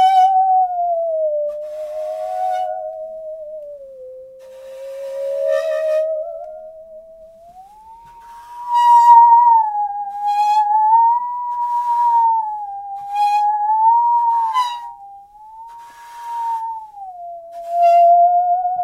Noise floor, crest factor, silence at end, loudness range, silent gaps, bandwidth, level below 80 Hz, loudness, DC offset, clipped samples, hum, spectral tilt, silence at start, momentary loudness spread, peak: -42 dBFS; 16 dB; 0 s; 13 LU; none; 12.5 kHz; -64 dBFS; -15 LUFS; under 0.1%; under 0.1%; none; -1 dB/octave; 0 s; 23 LU; 0 dBFS